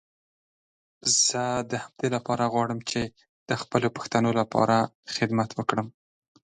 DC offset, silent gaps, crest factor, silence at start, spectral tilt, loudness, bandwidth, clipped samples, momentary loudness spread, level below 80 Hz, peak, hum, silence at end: under 0.1%; 3.29-3.46 s, 4.95-5.03 s; 22 dB; 1.05 s; -3.5 dB/octave; -26 LUFS; 11 kHz; under 0.1%; 10 LU; -62 dBFS; -6 dBFS; none; 0.65 s